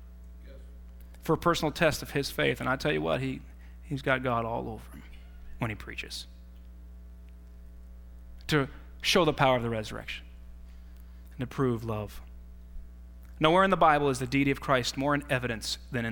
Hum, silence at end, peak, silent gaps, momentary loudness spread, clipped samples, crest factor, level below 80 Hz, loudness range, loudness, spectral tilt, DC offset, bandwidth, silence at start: none; 0 s; -8 dBFS; none; 26 LU; under 0.1%; 22 dB; -46 dBFS; 11 LU; -28 LUFS; -5 dB/octave; under 0.1%; 18 kHz; 0 s